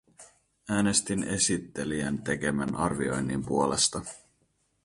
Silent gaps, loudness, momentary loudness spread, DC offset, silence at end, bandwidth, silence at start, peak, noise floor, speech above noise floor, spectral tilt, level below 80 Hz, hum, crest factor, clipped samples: none; -28 LUFS; 7 LU; under 0.1%; 0.65 s; 11.5 kHz; 0.2 s; -10 dBFS; -72 dBFS; 43 dB; -3.5 dB/octave; -54 dBFS; none; 20 dB; under 0.1%